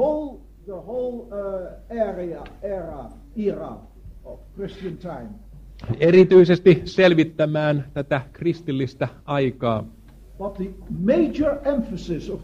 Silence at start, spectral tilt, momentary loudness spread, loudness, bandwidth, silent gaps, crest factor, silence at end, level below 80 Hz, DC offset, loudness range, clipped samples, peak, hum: 0 s; -8 dB/octave; 21 LU; -21 LUFS; 7.2 kHz; none; 20 dB; 0 s; -44 dBFS; under 0.1%; 14 LU; under 0.1%; -2 dBFS; none